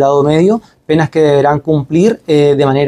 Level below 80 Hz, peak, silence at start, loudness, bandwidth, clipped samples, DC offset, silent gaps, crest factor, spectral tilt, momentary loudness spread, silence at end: -46 dBFS; 0 dBFS; 0 s; -11 LUFS; 10.5 kHz; under 0.1%; under 0.1%; none; 10 dB; -7.5 dB/octave; 4 LU; 0 s